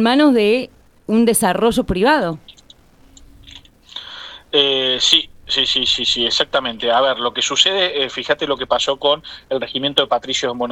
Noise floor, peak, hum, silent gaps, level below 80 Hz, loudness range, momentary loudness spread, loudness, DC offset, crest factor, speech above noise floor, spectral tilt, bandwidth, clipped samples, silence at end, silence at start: -47 dBFS; 0 dBFS; none; none; -44 dBFS; 5 LU; 12 LU; -16 LUFS; under 0.1%; 18 dB; 31 dB; -3 dB/octave; 17.5 kHz; under 0.1%; 0 s; 0 s